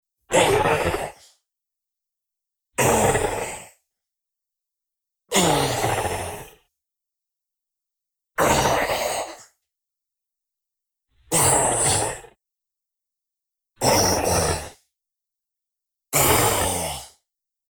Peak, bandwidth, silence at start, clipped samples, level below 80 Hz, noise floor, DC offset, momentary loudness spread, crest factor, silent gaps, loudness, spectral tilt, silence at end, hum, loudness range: -4 dBFS; 19 kHz; 0.3 s; under 0.1%; -44 dBFS; -86 dBFS; under 0.1%; 15 LU; 22 dB; none; -20 LUFS; -3 dB/octave; 0.6 s; none; 4 LU